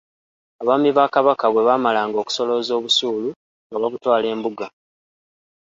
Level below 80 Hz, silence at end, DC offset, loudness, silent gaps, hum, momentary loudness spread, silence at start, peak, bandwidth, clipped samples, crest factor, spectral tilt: -70 dBFS; 0.95 s; under 0.1%; -19 LUFS; 3.36-3.70 s; none; 11 LU; 0.6 s; -2 dBFS; 7.8 kHz; under 0.1%; 20 dB; -3.5 dB/octave